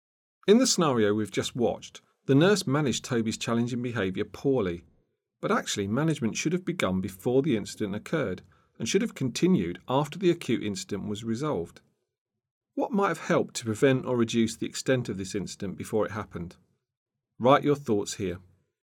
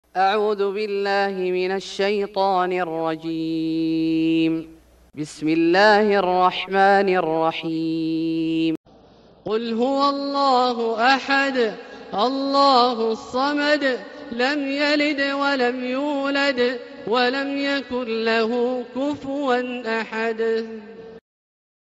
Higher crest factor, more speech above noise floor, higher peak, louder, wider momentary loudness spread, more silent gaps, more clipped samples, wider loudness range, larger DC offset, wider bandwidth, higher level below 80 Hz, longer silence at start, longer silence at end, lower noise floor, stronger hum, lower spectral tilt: about the same, 20 dB vs 18 dB; first, 44 dB vs 30 dB; about the same, -6 dBFS vs -4 dBFS; second, -27 LUFS vs -21 LUFS; first, 12 LU vs 9 LU; first, 12.21-12.26 s, 12.51-12.61 s, 16.97-17.06 s vs 8.77-8.84 s; neither; about the same, 4 LU vs 4 LU; neither; first, 18.5 kHz vs 9.6 kHz; about the same, -66 dBFS vs -62 dBFS; first, 0.45 s vs 0.15 s; second, 0.45 s vs 0.75 s; first, -71 dBFS vs -50 dBFS; neither; about the same, -5 dB/octave vs -5 dB/octave